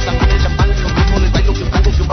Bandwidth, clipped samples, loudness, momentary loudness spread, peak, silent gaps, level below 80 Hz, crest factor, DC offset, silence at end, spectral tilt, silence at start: 6.4 kHz; under 0.1%; -14 LUFS; 2 LU; 0 dBFS; none; -14 dBFS; 12 dB; under 0.1%; 0 s; -6 dB/octave; 0 s